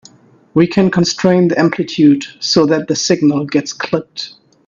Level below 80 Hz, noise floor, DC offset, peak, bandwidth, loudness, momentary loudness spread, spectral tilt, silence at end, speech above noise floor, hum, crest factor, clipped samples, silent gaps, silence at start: -54 dBFS; -45 dBFS; under 0.1%; 0 dBFS; 7.4 kHz; -14 LUFS; 8 LU; -5 dB/octave; 0.4 s; 32 dB; none; 14 dB; under 0.1%; none; 0.55 s